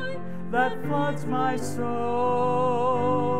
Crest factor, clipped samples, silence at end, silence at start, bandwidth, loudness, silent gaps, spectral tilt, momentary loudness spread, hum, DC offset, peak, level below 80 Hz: 16 dB; under 0.1%; 0 s; 0 s; 15 kHz; -26 LUFS; none; -6.5 dB/octave; 6 LU; none; 3%; -10 dBFS; -62 dBFS